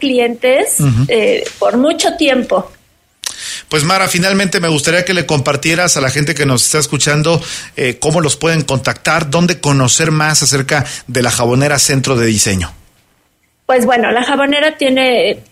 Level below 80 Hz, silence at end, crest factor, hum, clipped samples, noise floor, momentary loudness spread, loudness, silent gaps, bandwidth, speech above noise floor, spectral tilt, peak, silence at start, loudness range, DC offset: -42 dBFS; 0.1 s; 12 dB; none; under 0.1%; -58 dBFS; 7 LU; -12 LUFS; none; 16 kHz; 45 dB; -3.5 dB/octave; 0 dBFS; 0 s; 2 LU; under 0.1%